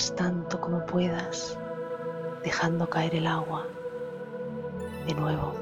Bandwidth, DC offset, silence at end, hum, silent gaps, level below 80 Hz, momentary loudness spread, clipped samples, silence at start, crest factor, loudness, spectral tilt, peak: 15.5 kHz; under 0.1%; 0 s; none; none; -56 dBFS; 9 LU; under 0.1%; 0 s; 18 dB; -31 LUFS; -5 dB/octave; -12 dBFS